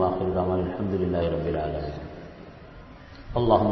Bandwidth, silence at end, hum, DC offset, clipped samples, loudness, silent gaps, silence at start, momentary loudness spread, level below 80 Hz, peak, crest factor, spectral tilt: 6 kHz; 0 s; none; under 0.1%; under 0.1%; -26 LUFS; none; 0 s; 22 LU; -42 dBFS; -6 dBFS; 20 dB; -10 dB/octave